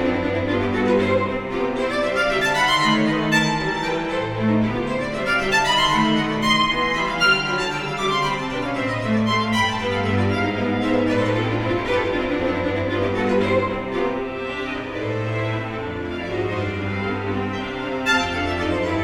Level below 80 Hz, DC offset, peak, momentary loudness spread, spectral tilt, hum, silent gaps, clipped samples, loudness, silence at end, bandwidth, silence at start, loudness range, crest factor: -42 dBFS; under 0.1%; -4 dBFS; 8 LU; -5 dB/octave; none; none; under 0.1%; -21 LUFS; 0 s; 16 kHz; 0 s; 6 LU; 16 dB